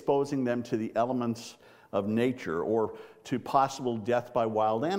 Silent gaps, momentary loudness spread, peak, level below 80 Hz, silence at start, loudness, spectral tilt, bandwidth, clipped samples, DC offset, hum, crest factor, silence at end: none; 8 LU; -10 dBFS; -70 dBFS; 0 s; -30 LUFS; -6.5 dB/octave; 16 kHz; under 0.1%; under 0.1%; none; 18 dB; 0 s